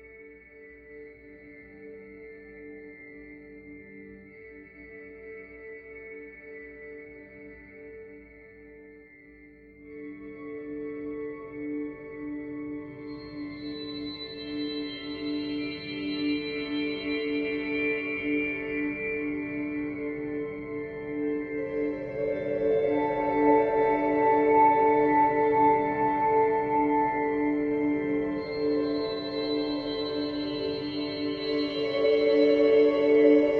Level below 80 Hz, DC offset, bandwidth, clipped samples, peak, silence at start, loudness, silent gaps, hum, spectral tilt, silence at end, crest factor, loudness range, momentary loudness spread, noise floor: -58 dBFS; under 0.1%; 5.4 kHz; under 0.1%; -8 dBFS; 0 s; -27 LUFS; none; none; -7.5 dB/octave; 0 s; 20 dB; 23 LU; 24 LU; -52 dBFS